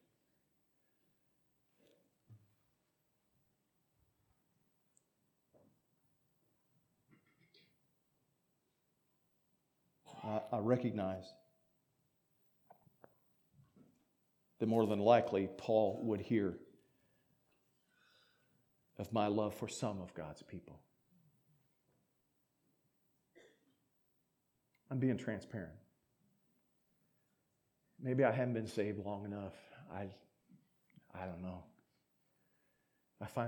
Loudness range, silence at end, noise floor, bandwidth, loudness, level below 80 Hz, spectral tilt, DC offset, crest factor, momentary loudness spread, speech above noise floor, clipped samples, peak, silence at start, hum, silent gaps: 16 LU; 0 s; -83 dBFS; 19 kHz; -38 LUFS; -78 dBFS; -7 dB/octave; under 0.1%; 28 dB; 19 LU; 45 dB; under 0.1%; -16 dBFS; 2.3 s; none; none